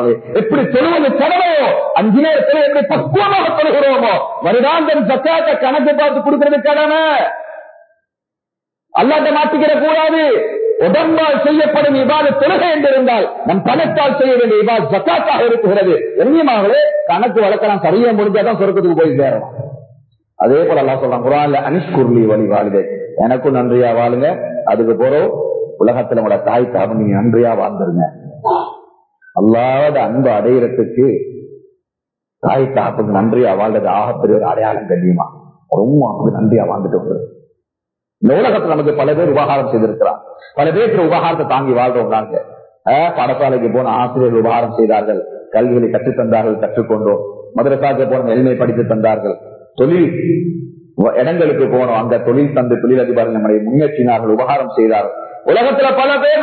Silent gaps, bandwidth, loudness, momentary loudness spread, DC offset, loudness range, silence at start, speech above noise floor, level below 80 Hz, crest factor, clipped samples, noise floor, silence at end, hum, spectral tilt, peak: none; 4.5 kHz; -13 LUFS; 6 LU; under 0.1%; 3 LU; 0 s; 70 dB; -56 dBFS; 12 dB; under 0.1%; -83 dBFS; 0 s; none; -11.5 dB/octave; 0 dBFS